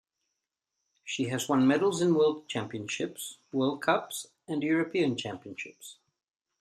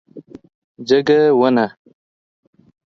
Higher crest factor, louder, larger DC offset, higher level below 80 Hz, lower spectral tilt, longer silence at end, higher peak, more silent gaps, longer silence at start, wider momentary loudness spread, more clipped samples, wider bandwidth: about the same, 20 dB vs 16 dB; second, -29 LUFS vs -15 LUFS; neither; second, -74 dBFS vs -64 dBFS; second, -5 dB/octave vs -6.5 dB/octave; second, 0.7 s vs 1.3 s; second, -10 dBFS vs -2 dBFS; second, none vs 0.55-0.75 s; first, 1.05 s vs 0.15 s; first, 16 LU vs 11 LU; neither; first, 14.5 kHz vs 7 kHz